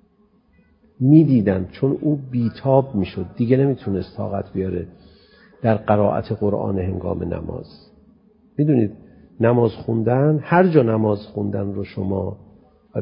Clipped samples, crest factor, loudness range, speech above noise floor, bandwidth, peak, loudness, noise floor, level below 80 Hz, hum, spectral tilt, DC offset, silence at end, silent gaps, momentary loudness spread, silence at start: under 0.1%; 18 dB; 4 LU; 39 dB; 5.4 kHz; -2 dBFS; -20 LUFS; -58 dBFS; -44 dBFS; none; -13.5 dB/octave; under 0.1%; 0 s; none; 12 LU; 1 s